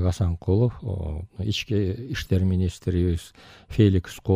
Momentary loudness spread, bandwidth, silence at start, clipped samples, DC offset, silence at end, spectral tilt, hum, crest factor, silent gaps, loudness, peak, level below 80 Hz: 11 LU; 13 kHz; 0 s; under 0.1%; under 0.1%; 0 s; -7 dB/octave; none; 18 dB; none; -25 LUFS; -6 dBFS; -38 dBFS